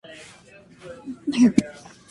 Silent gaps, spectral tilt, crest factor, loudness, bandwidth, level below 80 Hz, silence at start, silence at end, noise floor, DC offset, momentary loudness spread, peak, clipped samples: none; -5.5 dB/octave; 24 dB; -21 LUFS; 11.5 kHz; -58 dBFS; 0.1 s; 0.4 s; -50 dBFS; under 0.1%; 25 LU; -2 dBFS; under 0.1%